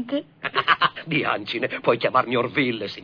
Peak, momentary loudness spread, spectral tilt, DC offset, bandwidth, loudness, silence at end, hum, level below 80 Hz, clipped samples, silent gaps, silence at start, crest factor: -4 dBFS; 7 LU; -6.5 dB/octave; under 0.1%; 5.4 kHz; -22 LUFS; 0 s; none; -64 dBFS; under 0.1%; none; 0 s; 20 dB